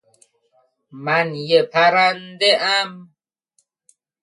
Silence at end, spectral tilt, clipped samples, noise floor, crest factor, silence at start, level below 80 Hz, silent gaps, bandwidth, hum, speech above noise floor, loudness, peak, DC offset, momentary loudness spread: 1.2 s; -3.5 dB/octave; under 0.1%; -67 dBFS; 18 dB; 0.95 s; -74 dBFS; none; 11.5 kHz; none; 49 dB; -17 LUFS; -2 dBFS; under 0.1%; 6 LU